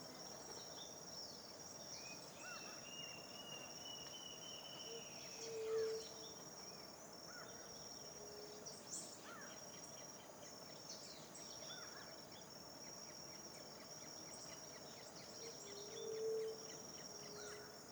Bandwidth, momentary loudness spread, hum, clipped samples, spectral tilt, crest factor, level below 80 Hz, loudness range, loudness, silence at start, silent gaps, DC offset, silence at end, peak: over 20 kHz; 7 LU; none; under 0.1%; -2 dB/octave; 18 dB; -84 dBFS; 4 LU; -51 LUFS; 0 s; none; under 0.1%; 0 s; -34 dBFS